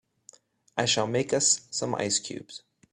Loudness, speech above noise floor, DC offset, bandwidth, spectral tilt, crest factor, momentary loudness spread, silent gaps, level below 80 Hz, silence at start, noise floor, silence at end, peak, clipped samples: -26 LUFS; 30 dB; under 0.1%; 13 kHz; -2.5 dB/octave; 22 dB; 17 LU; none; -68 dBFS; 0.75 s; -57 dBFS; 0.35 s; -8 dBFS; under 0.1%